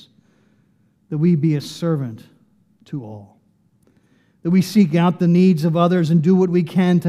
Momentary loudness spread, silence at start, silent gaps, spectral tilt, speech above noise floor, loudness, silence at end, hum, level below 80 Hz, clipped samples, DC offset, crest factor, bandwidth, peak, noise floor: 16 LU; 1.1 s; none; -8 dB/octave; 43 dB; -17 LUFS; 0 s; none; -68 dBFS; under 0.1%; under 0.1%; 16 dB; 13.5 kHz; -2 dBFS; -59 dBFS